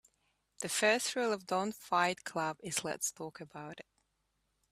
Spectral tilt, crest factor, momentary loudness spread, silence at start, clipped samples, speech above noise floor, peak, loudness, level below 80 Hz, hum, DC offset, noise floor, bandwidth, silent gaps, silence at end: -2.5 dB/octave; 22 dB; 18 LU; 0.6 s; under 0.1%; 45 dB; -14 dBFS; -34 LUFS; -78 dBFS; none; under 0.1%; -80 dBFS; 15.5 kHz; none; 0.9 s